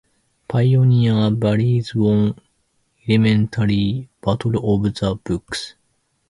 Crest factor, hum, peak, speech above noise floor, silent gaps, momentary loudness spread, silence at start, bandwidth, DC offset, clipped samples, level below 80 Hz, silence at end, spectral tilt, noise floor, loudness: 16 dB; none; -2 dBFS; 49 dB; none; 10 LU; 0.5 s; 11.5 kHz; under 0.1%; under 0.1%; -44 dBFS; 0.6 s; -7.5 dB/octave; -66 dBFS; -19 LUFS